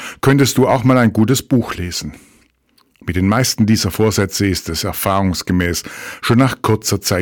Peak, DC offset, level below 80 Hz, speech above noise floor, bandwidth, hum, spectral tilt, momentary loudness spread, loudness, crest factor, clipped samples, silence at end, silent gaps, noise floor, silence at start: -4 dBFS; under 0.1%; -40 dBFS; 42 dB; 19 kHz; none; -5 dB/octave; 11 LU; -15 LUFS; 12 dB; under 0.1%; 0 s; none; -57 dBFS; 0 s